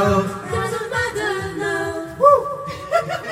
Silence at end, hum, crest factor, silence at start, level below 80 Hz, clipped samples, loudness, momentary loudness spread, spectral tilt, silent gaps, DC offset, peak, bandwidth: 0 s; none; 20 dB; 0 s; -48 dBFS; under 0.1%; -20 LUFS; 10 LU; -5 dB/octave; none; under 0.1%; 0 dBFS; 16 kHz